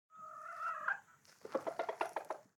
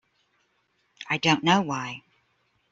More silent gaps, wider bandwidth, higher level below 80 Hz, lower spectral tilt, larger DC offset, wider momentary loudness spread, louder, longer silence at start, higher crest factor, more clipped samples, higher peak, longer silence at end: neither; first, 17.5 kHz vs 7.8 kHz; second, under -90 dBFS vs -66 dBFS; second, -3 dB/octave vs -4.5 dB/octave; neither; second, 10 LU vs 20 LU; second, -42 LUFS vs -24 LUFS; second, 0.1 s vs 1 s; about the same, 20 dB vs 22 dB; neither; second, -24 dBFS vs -6 dBFS; second, 0.15 s vs 0.7 s